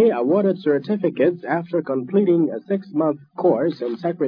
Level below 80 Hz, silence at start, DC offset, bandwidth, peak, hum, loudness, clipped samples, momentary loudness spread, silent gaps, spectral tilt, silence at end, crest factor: -78 dBFS; 0 s; under 0.1%; 5.2 kHz; -6 dBFS; none; -21 LUFS; under 0.1%; 6 LU; none; -10.5 dB/octave; 0 s; 14 dB